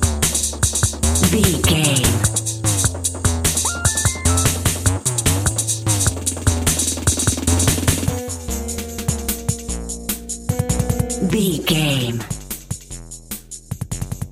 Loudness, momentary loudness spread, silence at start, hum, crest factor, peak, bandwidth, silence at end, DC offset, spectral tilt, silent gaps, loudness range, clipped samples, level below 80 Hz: -18 LUFS; 12 LU; 0 s; none; 18 dB; 0 dBFS; 16 kHz; 0 s; under 0.1%; -3.5 dB/octave; none; 5 LU; under 0.1%; -30 dBFS